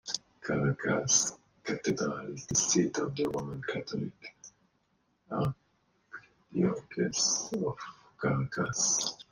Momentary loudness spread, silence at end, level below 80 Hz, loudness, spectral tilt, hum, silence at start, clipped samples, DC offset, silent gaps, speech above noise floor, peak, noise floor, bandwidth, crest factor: 18 LU; 0.1 s; -62 dBFS; -31 LUFS; -3.5 dB/octave; none; 0.05 s; under 0.1%; under 0.1%; none; 43 dB; -12 dBFS; -74 dBFS; 15 kHz; 22 dB